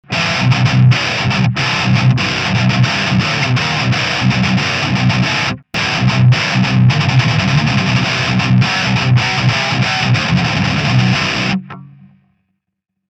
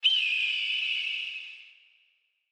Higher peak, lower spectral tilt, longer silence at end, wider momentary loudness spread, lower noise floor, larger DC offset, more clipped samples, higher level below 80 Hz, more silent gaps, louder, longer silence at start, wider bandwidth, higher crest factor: first, 0 dBFS vs -14 dBFS; first, -5 dB/octave vs 9.5 dB/octave; first, 1.25 s vs 0.8 s; second, 3 LU vs 18 LU; about the same, -74 dBFS vs -71 dBFS; neither; neither; first, -40 dBFS vs under -90 dBFS; neither; first, -13 LUFS vs -26 LUFS; about the same, 0.1 s vs 0 s; second, 8.4 kHz vs 10.5 kHz; about the same, 14 dB vs 18 dB